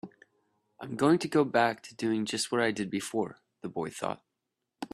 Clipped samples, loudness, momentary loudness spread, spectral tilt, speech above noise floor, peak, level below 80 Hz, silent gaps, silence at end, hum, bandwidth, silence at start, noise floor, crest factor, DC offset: under 0.1%; -30 LUFS; 18 LU; -4.5 dB/octave; 55 dB; -10 dBFS; -72 dBFS; none; 0.1 s; none; 13.5 kHz; 0.05 s; -85 dBFS; 20 dB; under 0.1%